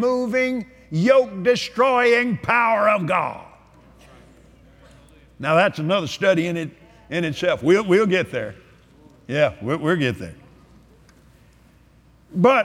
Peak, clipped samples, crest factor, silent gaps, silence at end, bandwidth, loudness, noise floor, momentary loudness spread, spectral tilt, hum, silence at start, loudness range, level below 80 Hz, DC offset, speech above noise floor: -4 dBFS; under 0.1%; 18 dB; none; 0 s; 13.5 kHz; -20 LUFS; -53 dBFS; 13 LU; -6 dB/octave; none; 0 s; 7 LU; -56 dBFS; under 0.1%; 34 dB